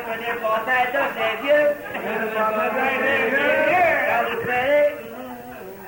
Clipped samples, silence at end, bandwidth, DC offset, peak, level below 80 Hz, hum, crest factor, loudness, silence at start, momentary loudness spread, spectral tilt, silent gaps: under 0.1%; 0 s; 16.5 kHz; under 0.1%; -8 dBFS; -58 dBFS; none; 12 dB; -20 LUFS; 0 s; 13 LU; -4.5 dB/octave; none